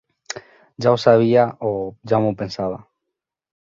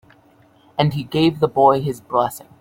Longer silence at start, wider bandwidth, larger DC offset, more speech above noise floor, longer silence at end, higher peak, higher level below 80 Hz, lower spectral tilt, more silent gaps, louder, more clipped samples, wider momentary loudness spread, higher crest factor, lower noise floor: second, 0.3 s vs 0.8 s; second, 7.8 kHz vs 16.5 kHz; neither; first, 64 dB vs 35 dB; first, 0.95 s vs 0.2 s; about the same, -2 dBFS vs -2 dBFS; about the same, -56 dBFS vs -54 dBFS; about the same, -6.5 dB/octave vs -6.5 dB/octave; neither; about the same, -19 LUFS vs -19 LUFS; neither; first, 19 LU vs 7 LU; about the same, 18 dB vs 18 dB; first, -82 dBFS vs -53 dBFS